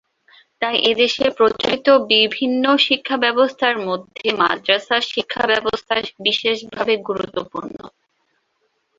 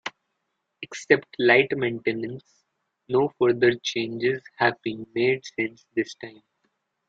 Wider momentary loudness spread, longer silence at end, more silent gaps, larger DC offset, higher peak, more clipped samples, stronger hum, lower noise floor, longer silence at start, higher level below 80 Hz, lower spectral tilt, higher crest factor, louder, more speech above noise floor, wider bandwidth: second, 10 LU vs 18 LU; first, 1.1 s vs 0.8 s; neither; neither; about the same, 0 dBFS vs -2 dBFS; neither; neither; second, -68 dBFS vs -78 dBFS; first, 0.6 s vs 0.05 s; first, -58 dBFS vs -68 dBFS; second, -3.5 dB/octave vs -5 dB/octave; second, 18 dB vs 24 dB; first, -18 LUFS vs -24 LUFS; second, 50 dB vs 54 dB; about the same, 7.6 kHz vs 7.8 kHz